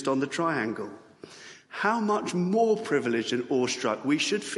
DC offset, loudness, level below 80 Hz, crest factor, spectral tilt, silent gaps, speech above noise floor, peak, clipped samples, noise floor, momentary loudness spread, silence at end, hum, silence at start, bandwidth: under 0.1%; -27 LUFS; -76 dBFS; 18 dB; -4.5 dB/octave; none; 21 dB; -10 dBFS; under 0.1%; -48 dBFS; 16 LU; 0 s; none; 0 s; 11.5 kHz